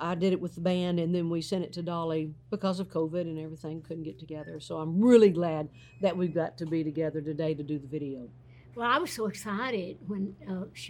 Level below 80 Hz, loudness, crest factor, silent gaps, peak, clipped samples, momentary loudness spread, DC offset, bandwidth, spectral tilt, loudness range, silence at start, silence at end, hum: -64 dBFS; -30 LUFS; 22 dB; none; -8 dBFS; under 0.1%; 13 LU; under 0.1%; 18 kHz; -6.5 dB/octave; 6 LU; 0 s; 0 s; none